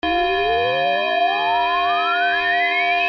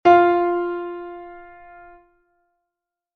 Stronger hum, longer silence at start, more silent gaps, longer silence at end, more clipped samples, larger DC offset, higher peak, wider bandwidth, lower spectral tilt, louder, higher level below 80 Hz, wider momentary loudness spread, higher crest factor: neither; about the same, 0.05 s vs 0.05 s; neither; second, 0 s vs 1.75 s; neither; neither; second, -10 dBFS vs -2 dBFS; about the same, 6.4 kHz vs 6.2 kHz; second, -4.5 dB/octave vs -6.5 dB/octave; about the same, -18 LUFS vs -19 LUFS; first, -48 dBFS vs -60 dBFS; second, 2 LU vs 26 LU; second, 10 dB vs 20 dB